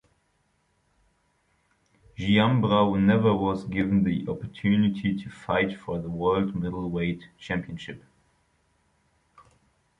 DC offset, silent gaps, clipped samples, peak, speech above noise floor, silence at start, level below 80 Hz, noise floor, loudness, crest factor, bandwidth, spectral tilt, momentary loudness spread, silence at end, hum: under 0.1%; none; under 0.1%; -8 dBFS; 45 dB; 2.2 s; -52 dBFS; -70 dBFS; -25 LUFS; 20 dB; 7.4 kHz; -8 dB/octave; 13 LU; 2 s; none